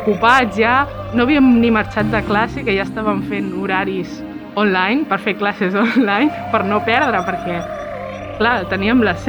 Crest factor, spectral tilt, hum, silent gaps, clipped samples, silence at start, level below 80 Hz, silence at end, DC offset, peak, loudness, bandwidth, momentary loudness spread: 16 dB; -6.5 dB/octave; none; none; under 0.1%; 0 s; -40 dBFS; 0 s; under 0.1%; 0 dBFS; -16 LUFS; 19 kHz; 12 LU